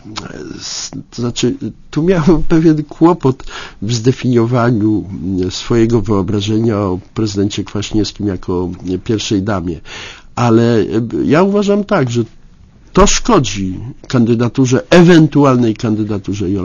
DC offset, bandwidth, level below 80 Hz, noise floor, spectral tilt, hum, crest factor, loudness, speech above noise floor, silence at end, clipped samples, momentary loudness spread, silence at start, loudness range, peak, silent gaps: under 0.1%; 7.4 kHz; -30 dBFS; -41 dBFS; -6 dB/octave; none; 14 dB; -13 LUFS; 28 dB; 0 s; 0.2%; 12 LU; 0.05 s; 5 LU; 0 dBFS; none